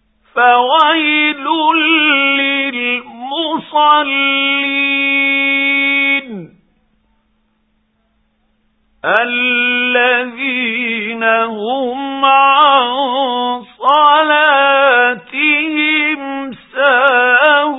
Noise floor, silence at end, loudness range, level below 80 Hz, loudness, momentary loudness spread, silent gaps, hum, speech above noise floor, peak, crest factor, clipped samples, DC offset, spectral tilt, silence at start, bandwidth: -61 dBFS; 0 s; 6 LU; -62 dBFS; -12 LUFS; 9 LU; none; none; 48 dB; 0 dBFS; 14 dB; under 0.1%; under 0.1%; -5.5 dB/octave; 0.35 s; 4 kHz